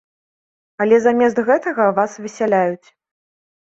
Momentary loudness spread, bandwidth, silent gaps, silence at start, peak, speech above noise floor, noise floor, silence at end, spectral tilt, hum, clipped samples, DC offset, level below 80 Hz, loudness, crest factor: 9 LU; 7.8 kHz; none; 0.8 s; -2 dBFS; over 74 dB; under -90 dBFS; 1.05 s; -6 dB/octave; none; under 0.1%; under 0.1%; -66 dBFS; -17 LUFS; 16 dB